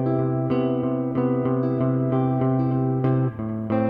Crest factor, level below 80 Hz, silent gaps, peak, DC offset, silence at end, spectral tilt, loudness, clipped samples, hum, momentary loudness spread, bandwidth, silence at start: 12 dB; -54 dBFS; none; -10 dBFS; under 0.1%; 0 s; -12 dB/octave; -23 LUFS; under 0.1%; none; 2 LU; 3.7 kHz; 0 s